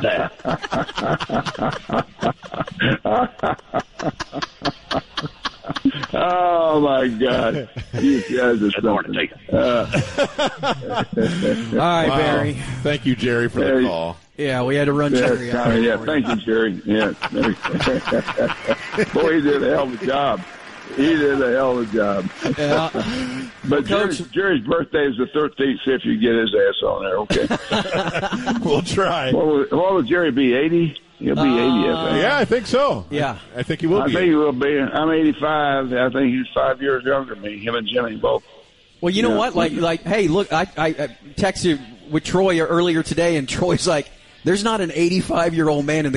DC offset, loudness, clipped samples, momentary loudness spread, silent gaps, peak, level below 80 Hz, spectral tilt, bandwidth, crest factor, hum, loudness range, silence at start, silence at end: under 0.1%; -20 LUFS; under 0.1%; 8 LU; none; -6 dBFS; -46 dBFS; -5.5 dB/octave; 11.5 kHz; 12 dB; none; 3 LU; 0 s; 0 s